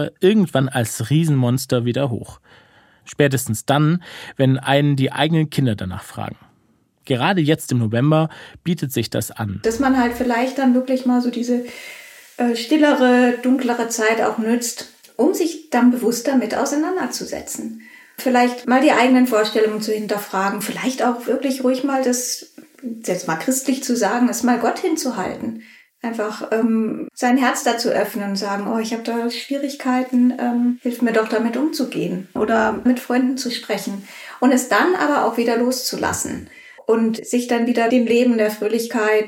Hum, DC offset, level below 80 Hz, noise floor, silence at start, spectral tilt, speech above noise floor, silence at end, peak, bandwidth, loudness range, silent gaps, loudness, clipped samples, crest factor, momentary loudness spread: none; under 0.1%; -58 dBFS; -60 dBFS; 0 s; -5 dB/octave; 41 dB; 0 s; -2 dBFS; 17 kHz; 3 LU; none; -19 LUFS; under 0.1%; 18 dB; 11 LU